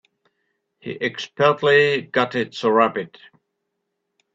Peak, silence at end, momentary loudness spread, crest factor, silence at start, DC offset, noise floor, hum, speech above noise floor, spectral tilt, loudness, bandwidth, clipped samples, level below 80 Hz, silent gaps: -2 dBFS; 1.3 s; 17 LU; 20 dB; 0.85 s; under 0.1%; -77 dBFS; none; 57 dB; -5.5 dB/octave; -19 LUFS; 7.8 kHz; under 0.1%; -66 dBFS; none